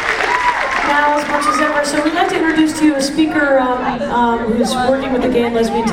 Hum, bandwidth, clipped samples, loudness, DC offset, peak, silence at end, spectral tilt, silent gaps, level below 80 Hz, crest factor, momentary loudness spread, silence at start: none; 16 kHz; under 0.1%; -14 LUFS; under 0.1%; 0 dBFS; 0 s; -4 dB/octave; none; -40 dBFS; 14 dB; 3 LU; 0 s